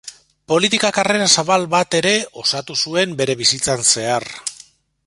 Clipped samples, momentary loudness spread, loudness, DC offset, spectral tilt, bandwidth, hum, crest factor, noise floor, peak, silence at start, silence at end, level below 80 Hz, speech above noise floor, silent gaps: under 0.1%; 8 LU; -16 LUFS; under 0.1%; -2 dB/octave; 11.5 kHz; none; 18 dB; -47 dBFS; 0 dBFS; 0.05 s; 0.55 s; -56 dBFS; 30 dB; none